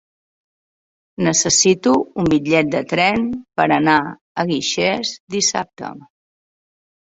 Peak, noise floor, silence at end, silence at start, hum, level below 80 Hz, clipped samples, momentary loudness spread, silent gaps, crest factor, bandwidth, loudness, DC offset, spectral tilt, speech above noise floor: -2 dBFS; under -90 dBFS; 1.05 s; 1.2 s; none; -52 dBFS; under 0.1%; 11 LU; 4.21-4.35 s, 5.20-5.27 s; 18 dB; 8.2 kHz; -17 LUFS; under 0.1%; -3 dB/octave; over 73 dB